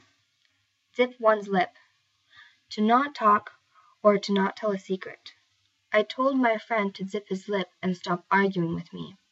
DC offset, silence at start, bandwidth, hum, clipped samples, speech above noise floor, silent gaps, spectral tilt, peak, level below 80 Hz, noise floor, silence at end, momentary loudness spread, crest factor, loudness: under 0.1%; 1 s; 8 kHz; none; under 0.1%; 45 dB; none; -6.5 dB/octave; -8 dBFS; -76 dBFS; -71 dBFS; 0.2 s; 12 LU; 20 dB; -26 LUFS